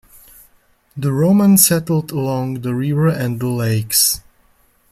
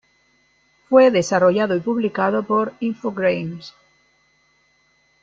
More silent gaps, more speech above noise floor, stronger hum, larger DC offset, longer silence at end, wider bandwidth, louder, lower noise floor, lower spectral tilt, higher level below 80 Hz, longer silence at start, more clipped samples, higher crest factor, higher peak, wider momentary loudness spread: neither; about the same, 40 dB vs 43 dB; neither; neither; second, 0.7 s vs 1.55 s; first, 16.5 kHz vs 7.8 kHz; first, -16 LUFS vs -19 LUFS; second, -56 dBFS vs -61 dBFS; second, -4.5 dB/octave vs -6 dB/octave; first, -50 dBFS vs -64 dBFS; about the same, 0.95 s vs 0.9 s; neither; about the same, 18 dB vs 18 dB; about the same, 0 dBFS vs -2 dBFS; about the same, 11 LU vs 11 LU